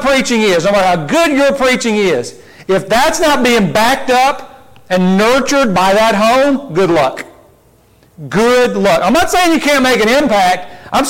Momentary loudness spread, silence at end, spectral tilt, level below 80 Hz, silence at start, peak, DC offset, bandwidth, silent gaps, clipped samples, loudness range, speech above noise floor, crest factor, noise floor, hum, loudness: 7 LU; 0 s; -4 dB/octave; -38 dBFS; 0 s; -4 dBFS; under 0.1%; 17 kHz; none; under 0.1%; 2 LU; 37 dB; 8 dB; -48 dBFS; none; -11 LUFS